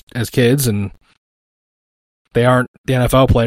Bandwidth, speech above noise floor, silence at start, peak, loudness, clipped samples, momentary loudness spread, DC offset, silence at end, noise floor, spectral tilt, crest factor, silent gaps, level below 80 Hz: 16.5 kHz; over 76 dB; 0.15 s; 0 dBFS; -16 LUFS; under 0.1%; 9 LU; under 0.1%; 0 s; under -90 dBFS; -6 dB/octave; 16 dB; 1.18-2.25 s, 2.68-2.84 s; -32 dBFS